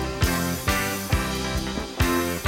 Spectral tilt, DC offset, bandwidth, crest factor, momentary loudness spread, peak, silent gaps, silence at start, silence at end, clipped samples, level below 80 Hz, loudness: -4 dB/octave; under 0.1%; 17 kHz; 16 dB; 4 LU; -8 dBFS; none; 0 s; 0 s; under 0.1%; -32 dBFS; -25 LUFS